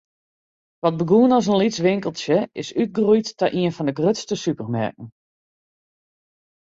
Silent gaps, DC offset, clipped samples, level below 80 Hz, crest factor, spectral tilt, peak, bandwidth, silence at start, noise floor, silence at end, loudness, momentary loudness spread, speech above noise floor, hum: none; under 0.1%; under 0.1%; -62 dBFS; 16 dB; -6 dB/octave; -6 dBFS; 8 kHz; 0.85 s; under -90 dBFS; 1.6 s; -21 LUFS; 9 LU; over 70 dB; none